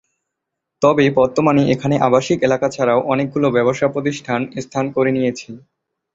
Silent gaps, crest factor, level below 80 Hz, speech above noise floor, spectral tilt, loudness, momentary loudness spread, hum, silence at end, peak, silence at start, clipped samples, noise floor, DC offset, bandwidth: none; 16 dB; -54 dBFS; 63 dB; -6.5 dB/octave; -17 LUFS; 8 LU; none; 0.55 s; -2 dBFS; 0.8 s; under 0.1%; -79 dBFS; under 0.1%; 7.8 kHz